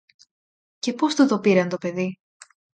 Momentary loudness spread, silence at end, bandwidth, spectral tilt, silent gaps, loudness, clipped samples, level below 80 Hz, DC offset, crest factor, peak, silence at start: 11 LU; 0.65 s; 9.2 kHz; -5.5 dB/octave; none; -22 LUFS; under 0.1%; -72 dBFS; under 0.1%; 18 dB; -6 dBFS; 0.85 s